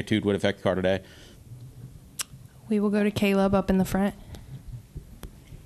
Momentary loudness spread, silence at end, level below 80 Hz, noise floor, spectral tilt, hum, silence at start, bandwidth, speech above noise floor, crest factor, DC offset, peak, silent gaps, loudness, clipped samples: 23 LU; 0 s; -48 dBFS; -46 dBFS; -6 dB/octave; none; 0 s; 13.5 kHz; 21 dB; 18 dB; under 0.1%; -8 dBFS; none; -26 LUFS; under 0.1%